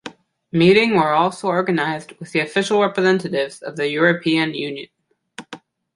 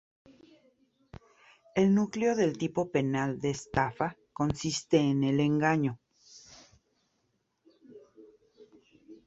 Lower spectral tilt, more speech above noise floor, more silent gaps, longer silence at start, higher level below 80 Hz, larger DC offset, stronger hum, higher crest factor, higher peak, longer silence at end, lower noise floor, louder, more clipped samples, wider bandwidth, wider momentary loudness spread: about the same, -5.5 dB/octave vs -6 dB/octave; second, 23 dB vs 49 dB; neither; second, 0.05 s vs 1.75 s; about the same, -62 dBFS vs -58 dBFS; neither; neither; about the same, 18 dB vs 20 dB; first, -2 dBFS vs -10 dBFS; first, 0.4 s vs 0.1 s; second, -42 dBFS vs -77 dBFS; first, -18 LUFS vs -29 LUFS; neither; first, 11.5 kHz vs 8.2 kHz; first, 16 LU vs 9 LU